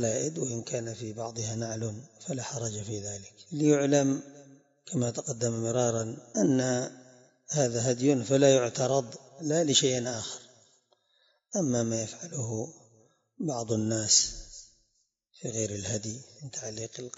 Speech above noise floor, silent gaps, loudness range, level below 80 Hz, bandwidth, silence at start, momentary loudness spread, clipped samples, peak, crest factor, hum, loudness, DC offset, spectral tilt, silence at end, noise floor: 46 dB; none; 7 LU; -62 dBFS; 8 kHz; 0 s; 16 LU; under 0.1%; -8 dBFS; 22 dB; none; -29 LUFS; under 0.1%; -4 dB/octave; 0.1 s; -75 dBFS